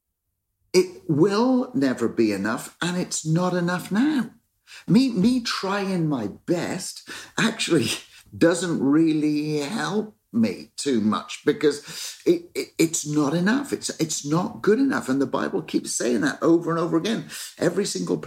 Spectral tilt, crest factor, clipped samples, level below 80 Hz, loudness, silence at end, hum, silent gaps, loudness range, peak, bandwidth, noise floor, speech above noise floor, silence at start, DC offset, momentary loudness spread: -5 dB/octave; 18 dB; under 0.1%; -64 dBFS; -23 LUFS; 0 s; none; none; 2 LU; -6 dBFS; 16 kHz; -78 dBFS; 56 dB; 0.75 s; under 0.1%; 8 LU